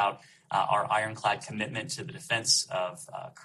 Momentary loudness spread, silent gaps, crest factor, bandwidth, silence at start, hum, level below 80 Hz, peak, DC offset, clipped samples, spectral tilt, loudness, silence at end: 13 LU; none; 20 dB; 13 kHz; 0 s; none; -72 dBFS; -10 dBFS; under 0.1%; under 0.1%; -2 dB/octave; -29 LUFS; 0 s